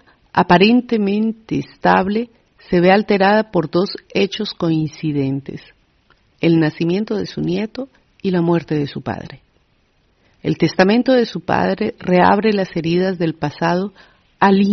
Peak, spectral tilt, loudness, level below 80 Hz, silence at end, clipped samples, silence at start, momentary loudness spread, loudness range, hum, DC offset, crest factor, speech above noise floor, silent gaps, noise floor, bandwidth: 0 dBFS; -5 dB/octave; -17 LUFS; -52 dBFS; 0 s; under 0.1%; 0.35 s; 13 LU; 5 LU; none; under 0.1%; 18 dB; 43 dB; none; -59 dBFS; 6.4 kHz